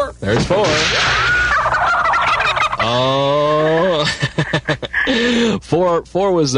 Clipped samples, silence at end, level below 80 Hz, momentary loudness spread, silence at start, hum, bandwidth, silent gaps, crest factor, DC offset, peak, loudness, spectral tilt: under 0.1%; 0 s; -36 dBFS; 5 LU; 0 s; none; 11 kHz; none; 14 dB; under 0.1%; -2 dBFS; -15 LUFS; -4.5 dB/octave